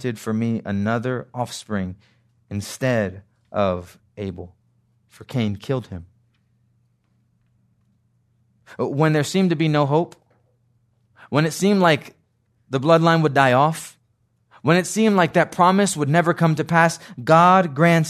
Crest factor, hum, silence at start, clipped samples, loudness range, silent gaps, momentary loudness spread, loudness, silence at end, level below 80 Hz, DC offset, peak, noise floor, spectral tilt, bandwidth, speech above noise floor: 20 dB; none; 0 s; under 0.1%; 13 LU; none; 15 LU; -19 LUFS; 0 s; -64 dBFS; under 0.1%; 0 dBFS; -66 dBFS; -6 dB/octave; 13.5 kHz; 47 dB